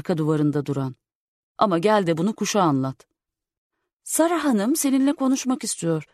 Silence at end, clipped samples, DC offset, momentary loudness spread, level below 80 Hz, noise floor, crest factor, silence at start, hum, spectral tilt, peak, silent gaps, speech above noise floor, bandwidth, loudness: 0.1 s; under 0.1%; under 0.1%; 7 LU; -68 dBFS; -82 dBFS; 18 dB; 0.05 s; none; -5 dB/octave; -4 dBFS; 1.15-1.55 s, 3.58-3.70 s, 3.93-4.00 s; 60 dB; 13.5 kHz; -22 LUFS